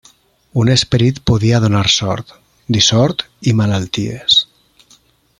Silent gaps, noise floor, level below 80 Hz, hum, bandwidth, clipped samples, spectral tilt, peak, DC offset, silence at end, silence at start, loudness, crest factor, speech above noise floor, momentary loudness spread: none; -51 dBFS; -40 dBFS; none; 11 kHz; under 0.1%; -4.5 dB/octave; 0 dBFS; under 0.1%; 0.95 s; 0.55 s; -14 LUFS; 16 dB; 38 dB; 9 LU